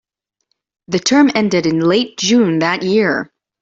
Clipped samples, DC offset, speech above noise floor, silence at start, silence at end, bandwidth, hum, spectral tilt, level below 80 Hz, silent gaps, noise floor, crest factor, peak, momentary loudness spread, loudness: under 0.1%; under 0.1%; 56 dB; 0.9 s; 0.35 s; 8 kHz; none; -4.5 dB/octave; -56 dBFS; none; -70 dBFS; 14 dB; 0 dBFS; 8 LU; -14 LUFS